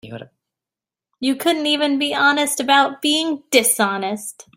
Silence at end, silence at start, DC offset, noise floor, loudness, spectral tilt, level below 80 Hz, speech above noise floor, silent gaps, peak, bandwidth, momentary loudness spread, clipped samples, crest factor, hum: 0.15 s; 0.05 s; under 0.1%; -89 dBFS; -17 LUFS; -1.5 dB/octave; -66 dBFS; 70 dB; none; -2 dBFS; 16.5 kHz; 10 LU; under 0.1%; 18 dB; none